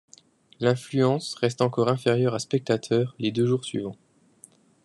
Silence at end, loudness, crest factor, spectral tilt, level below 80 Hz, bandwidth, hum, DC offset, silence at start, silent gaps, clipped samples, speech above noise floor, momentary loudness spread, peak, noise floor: 0.9 s; -25 LUFS; 20 dB; -6 dB/octave; -66 dBFS; 12 kHz; none; under 0.1%; 0.6 s; none; under 0.1%; 31 dB; 5 LU; -6 dBFS; -56 dBFS